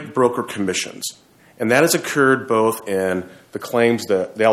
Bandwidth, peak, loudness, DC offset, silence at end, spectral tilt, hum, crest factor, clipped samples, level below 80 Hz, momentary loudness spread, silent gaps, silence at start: 16.5 kHz; -2 dBFS; -19 LUFS; under 0.1%; 0 s; -4 dB/octave; none; 18 dB; under 0.1%; -64 dBFS; 11 LU; none; 0 s